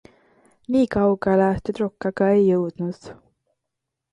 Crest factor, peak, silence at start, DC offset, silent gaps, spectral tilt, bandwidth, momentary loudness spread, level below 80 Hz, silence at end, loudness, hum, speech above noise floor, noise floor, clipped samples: 16 dB; -8 dBFS; 0.7 s; under 0.1%; none; -8.5 dB/octave; 9.8 kHz; 11 LU; -50 dBFS; 1 s; -21 LUFS; none; 62 dB; -82 dBFS; under 0.1%